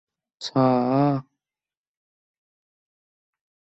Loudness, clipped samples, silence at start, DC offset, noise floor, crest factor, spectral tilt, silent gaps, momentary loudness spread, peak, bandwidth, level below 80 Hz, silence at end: -22 LUFS; under 0.1%; 0.4 s; under 0.1%; under -90 dBFS; 20 dB; -7.5 dB/octave; none; 10 LU; -8 dBFS; 8 kHz; -68 dBFS; 2.6 s